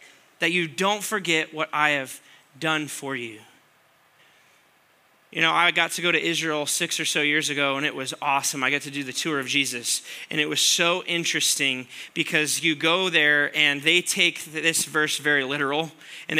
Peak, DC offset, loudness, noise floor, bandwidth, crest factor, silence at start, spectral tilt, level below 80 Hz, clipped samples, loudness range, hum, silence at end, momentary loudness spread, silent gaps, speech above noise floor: -4 dBFS; under 0.1%; -22 LUFS; -60 dBFS; 16 kHz; 22 dB; 0 s; -1.5 dB/octave; -82 dBFS; under 0.1%; 6 LU; none; 0 s; 10 LU; none; 36 dB